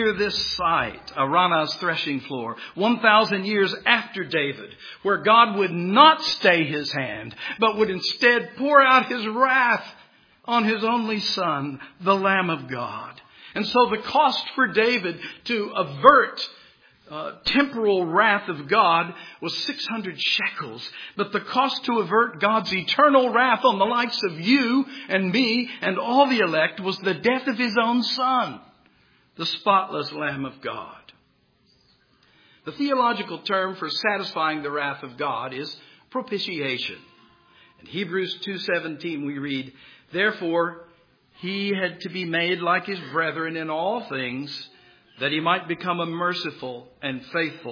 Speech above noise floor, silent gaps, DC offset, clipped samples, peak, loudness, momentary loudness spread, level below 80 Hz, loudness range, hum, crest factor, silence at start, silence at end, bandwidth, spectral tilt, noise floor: 41 dB; none; under 0.1%; under 0.1%; 0 dBFS; -22 LUFS; 14 LU; -62 dBFS; 9 LU; none; 24 dB; 0 s; 0 s; 5.4 kHz; -5 dB/octave; -63 dBFS